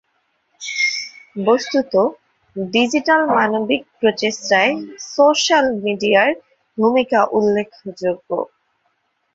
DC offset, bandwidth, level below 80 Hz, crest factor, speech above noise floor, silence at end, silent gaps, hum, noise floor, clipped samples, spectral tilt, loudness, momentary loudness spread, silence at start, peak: under 0.1%; 7.8 kHz; -62 dBFS; 18 dB; 50 dB; 0.9 s; none; none; -67 dBFS; under 0.1%; -3.5 dB/octave; -17 LUFS; 12 LU; 0.6 s; 0 dBFS